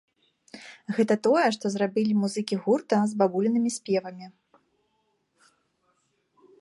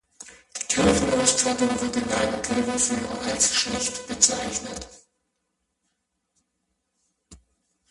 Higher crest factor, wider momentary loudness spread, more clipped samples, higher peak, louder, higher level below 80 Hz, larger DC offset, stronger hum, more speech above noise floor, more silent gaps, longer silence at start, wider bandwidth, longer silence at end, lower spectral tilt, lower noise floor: about the same, 20 dB vs 24 dB; first, 19 LU vs 12 LU; neither; second, -8 dBFS vs -2 dBFS; second, -25 LUFS vs -22 LUFS; second, -78 dBFS vs -48 dBFS; neither; neither; second, 48 dB vs 53 dB; neither; first, 0.55 s vs 0.2 s; about the same, 11.5 kHz vs 11.5 kHz; first, 2.3 s vs 0.55 s; first, -5.5 dB/octave vs -2 dB/octave; second, -73 dBFS vs -77 dBFS